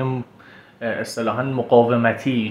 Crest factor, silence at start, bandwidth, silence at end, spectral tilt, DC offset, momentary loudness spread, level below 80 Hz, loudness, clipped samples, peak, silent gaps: 20 dB; 0 s; 13.5 kHz; 0 s; -6.5 dB/octave; under 0.1%; 14 LU; -62 dBFS; -20 LUFS; under 0.1%; -2 dBFS; none